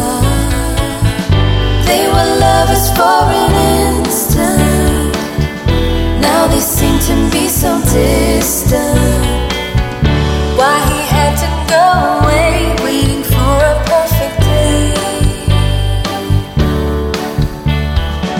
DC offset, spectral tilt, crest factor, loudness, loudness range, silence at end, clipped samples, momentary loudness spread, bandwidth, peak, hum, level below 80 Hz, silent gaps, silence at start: under 0.1%; -5 dB/octave; 12 dB; -12 LUFS; 2 LU; 0 s; under 0.1%; 6 LU; 17 kHz; 0 dBFS; none; -18 dBFS; none; 0 s